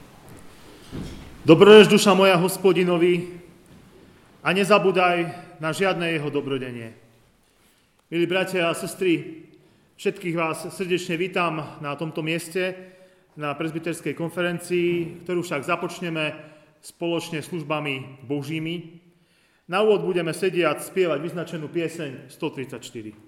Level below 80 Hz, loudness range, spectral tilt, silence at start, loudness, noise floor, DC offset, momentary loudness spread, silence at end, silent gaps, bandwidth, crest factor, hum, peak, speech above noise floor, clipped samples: -58 dBFS; 11 LU; -5 dB/octave; 0.25 s; -22 LUFS; -62 dBFS; under 0.1%; 15 LU; 0.15 s; none; 15.5 kHz; 24 dB; none; 0 dBFS; 40 dB; under 0.1%